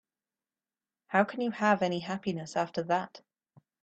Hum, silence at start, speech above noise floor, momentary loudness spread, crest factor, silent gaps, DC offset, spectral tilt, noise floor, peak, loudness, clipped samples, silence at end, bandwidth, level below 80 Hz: none; 1.1 s; over 60 dB; 7 LU; 22 dB; none; under 0.1%; -5.5 dB/octave; under -90 dBFS; -10 dBFS; -30 LUFS; under 0.1%; 0.65 s; 8.6 kHz; -74 dBFS